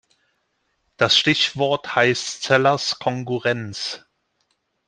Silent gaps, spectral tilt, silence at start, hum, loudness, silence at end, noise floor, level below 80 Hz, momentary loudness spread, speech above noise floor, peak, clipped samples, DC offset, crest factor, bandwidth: none; -3.5 dB/octave; 1 s; none; -20 LUFS; 0.9 s; -70 dBFS; -62 dBFS; 12 LU; 50 dB; -2 dBFS; under 0.1%; under 0.1%; 20 dB; 10 kHz